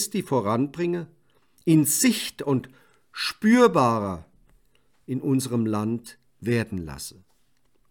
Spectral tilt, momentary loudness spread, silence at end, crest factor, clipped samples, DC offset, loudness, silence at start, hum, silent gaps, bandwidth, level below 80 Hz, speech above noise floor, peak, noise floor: -5 dB/octave; 16 LU; 0.8 s; 20 dB; under 0.1%; under 0.1%; -24 LUFS; 0 s; none; none; 18 kHz; -60 dBFS; 45 dB; -6 dBFS; -68 dBFS